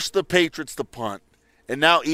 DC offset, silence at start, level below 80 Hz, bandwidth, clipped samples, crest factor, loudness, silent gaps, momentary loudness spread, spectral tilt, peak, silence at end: under 0.1%; 0 s; -58 dBFS; 16 kHz; under 0.1%; 22 dB; -22 LUFS; none; 14 LU; -3.5 dB/octave; -2 dBFS; 0 s